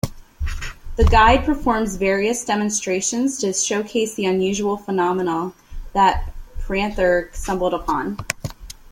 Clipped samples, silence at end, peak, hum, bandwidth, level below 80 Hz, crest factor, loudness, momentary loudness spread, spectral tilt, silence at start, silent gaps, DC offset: under 0.1%; 0.05 s; 0 dBFS; none; 16.5 kHz; -30 dBFS; 20 dB; -20 LUFS; 14 LU; -4 dB/octave; 0.05 s; none; under 0.1%